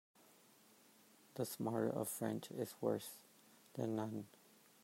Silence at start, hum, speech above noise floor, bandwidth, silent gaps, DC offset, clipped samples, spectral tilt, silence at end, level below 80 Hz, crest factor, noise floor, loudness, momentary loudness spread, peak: 1.35 s; none; 26 dB; 16 kHz; none; under 0.1%; under 0.1%; -5.5 dB/octave; 0.55 s; -88 dBFS; 20 dB; -68 dBFS; -43 LUFS; 16 LU; -24 dBFS